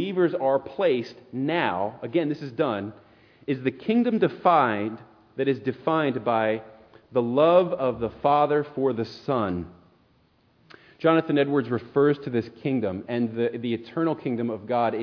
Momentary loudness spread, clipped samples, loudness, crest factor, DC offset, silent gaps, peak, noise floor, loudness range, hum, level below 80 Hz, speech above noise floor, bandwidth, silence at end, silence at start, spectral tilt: 9 LU; under 0.1%; -25 LUFS; 20 dB; under 0.1%; none; -6 dBFS; -63 dBFS; 3 LU; none; -62 dBFS; 39 dB; 5.4 kHz; 0 s; 0 s; -8.5 dB/octave